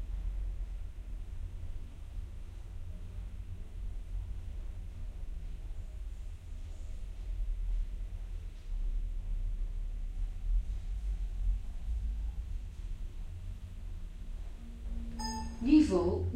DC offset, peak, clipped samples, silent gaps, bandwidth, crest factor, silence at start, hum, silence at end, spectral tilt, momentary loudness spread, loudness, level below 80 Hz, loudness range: under 0.1%; -14 dBFS; under 0.1%; none; 9.6 kHz; 22 dB; 0 s; none; 0 s; -7 dB/octave; 9 LU; -39 LUFS; -38 dBFS; 6 LU